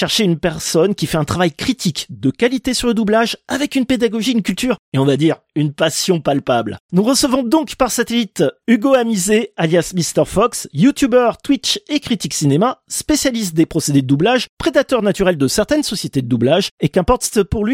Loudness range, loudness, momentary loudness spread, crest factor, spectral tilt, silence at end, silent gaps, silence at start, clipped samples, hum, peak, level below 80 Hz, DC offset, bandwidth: 2 LU; -16 LUFS; 5 LU; 14 dB; -4.5 dB/octave; 0 s; 4.79-4.92 s, 6.80-6.89 s, 14.49-14.57 s, 16.71-16.78 s; 0 s; under 0.1%; none; 0 dBFS; -40 dBFS; under 0.1%; 16.5 kHz